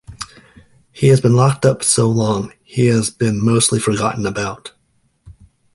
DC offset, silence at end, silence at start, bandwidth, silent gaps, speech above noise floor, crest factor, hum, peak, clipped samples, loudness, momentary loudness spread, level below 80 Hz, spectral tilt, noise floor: under 0.1%; 0.45 s; 0.1 s; 11.5 kHz; none; 47 dB; 16 dB; none; 0 dBFS; under 0.1%; -16 LUFS; 12 LU; -46 dBFS; -5 dB/octave; -61 dBFS